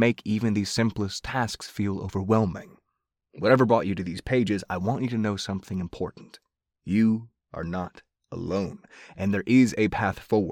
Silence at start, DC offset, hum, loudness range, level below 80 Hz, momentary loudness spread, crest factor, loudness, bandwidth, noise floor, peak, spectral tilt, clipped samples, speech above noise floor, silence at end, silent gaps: 0 s; under 0.1%; none; 5 LU; -52 dBFS; 14 LU; 20 dB; -26 LUFS; 15.5 kHz; -81 dBFS; -6 dBFS; -6.5 dB/octave; under 0.1%; 56 dB; 0 s; none